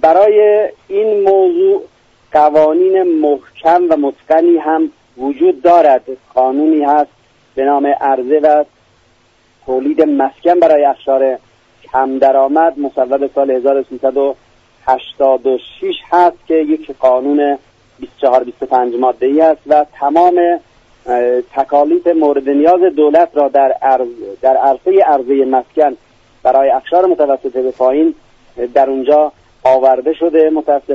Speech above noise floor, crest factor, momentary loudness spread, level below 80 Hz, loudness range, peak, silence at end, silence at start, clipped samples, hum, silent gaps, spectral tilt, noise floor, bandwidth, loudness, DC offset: 41 dB; 12 dB; 8 LU; -54 dBFS; 3 LU; 0 dBFS; 0 s; 0.05 s; under 0.1%; none; none; -6.5 dB/octave; -52 dBFS; 6.8 kHz; -12 LUFS; under 0.1%